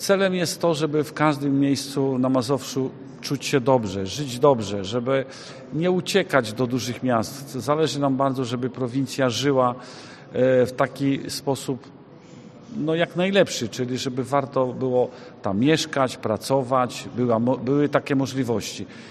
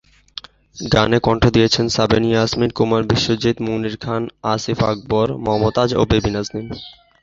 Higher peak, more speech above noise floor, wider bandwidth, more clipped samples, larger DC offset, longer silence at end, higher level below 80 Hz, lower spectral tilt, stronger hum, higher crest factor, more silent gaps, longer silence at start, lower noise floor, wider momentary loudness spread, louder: about the same, -2 dBFS vs 0 dBFS; about the same, 22 dB vs 21 dB; first, 13.5 kHz vs 7.8 kHz; neither; neither; second, 0 s vs 0.3 s; second, -62 dBFS vs -36 dBFS; about the same, -5.5 dB/octave vs -5.5 dB/octave; neither; about the same, 22 dB vs 18 dB; neither; second, 0 s vs 0.75 s; first, -45 dBFS vs -38 dBFS; second, 9 LU vs 16 LU; second, -23 LUFS vs -17 LUFS